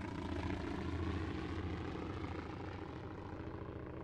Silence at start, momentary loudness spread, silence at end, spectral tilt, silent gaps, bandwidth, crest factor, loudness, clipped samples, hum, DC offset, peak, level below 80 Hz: 0 s; 7 LU; 0 s; -7.5 dB/octave; none; 9.6 kHz; 16 dB; -44 LUFS; under 0.1%; none; under 0.1%; -28 dBFS; -54 dBFS